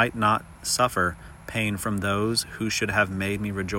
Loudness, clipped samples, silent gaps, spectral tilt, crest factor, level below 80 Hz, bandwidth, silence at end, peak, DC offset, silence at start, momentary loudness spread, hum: -25 LUFS; under 0.1%; none; -4 dB/octave; 18 dB; -50 dBFS; 16.5 kHz; 0 s; -8 dBFS; under 0.1%; 0 s; 5 LU; none